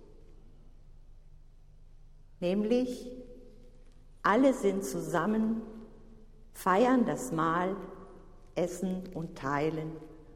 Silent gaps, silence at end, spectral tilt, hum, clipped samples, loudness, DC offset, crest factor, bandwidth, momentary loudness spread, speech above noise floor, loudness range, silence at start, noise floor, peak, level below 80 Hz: none; 0 s; -6 dB/octave; none; under 0.1%; -31 LUFS; under 0.1%; 20 dB; 16 kHz; 22 LU; 24 dB; 7 LU; 0 s; -53 dBFS; -12 dBFS; -54 dBFS